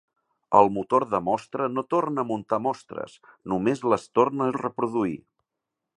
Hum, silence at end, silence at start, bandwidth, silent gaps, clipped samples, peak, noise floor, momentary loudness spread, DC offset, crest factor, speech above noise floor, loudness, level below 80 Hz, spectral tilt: none; 0.8 s; 0.5 s; 11 kHz; none; under 0.1%; -2 dBFS; -85 dBFS; 14 LU; under 0.1%; 24 dB; 60 dB; -25 LUFS; -64 dBFS; -7 dB/octave